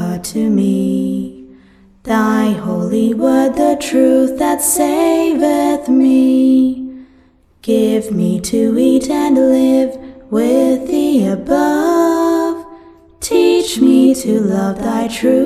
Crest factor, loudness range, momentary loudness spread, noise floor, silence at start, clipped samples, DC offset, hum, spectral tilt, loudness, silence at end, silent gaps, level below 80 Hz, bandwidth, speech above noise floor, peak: 12 dB; 2 LU; 7 LU; -49 dBFS; 0 s; under 0.1%; under 0.1%; none; -5.5 dB/octave; -13 LUFS; 0 s; none; -46 dBFS; 15 kHz; 37 dB; 0 dBFS